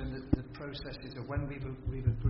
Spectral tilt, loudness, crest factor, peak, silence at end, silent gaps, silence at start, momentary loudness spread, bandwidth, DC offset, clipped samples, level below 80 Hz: -7 dB/octave; -38 LUFS; 24 dB; -12 dBFS; 0 s; none; 0 s; 9 LU; 5.8 kHz; under 0.1%; under 0.1%; -44 dBFS